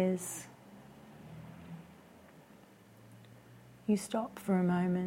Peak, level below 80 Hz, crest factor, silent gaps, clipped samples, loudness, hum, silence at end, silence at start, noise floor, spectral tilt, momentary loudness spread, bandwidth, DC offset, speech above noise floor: -20 dBFS; -72 dBFS; 18 dB; none; under 0.1%; -34 LUFS; none; 0 s; 0 s; -59 dBFS; -6.5 dB/octave; 26 LU; 16.5 kHz; under 0.1%; 26 dB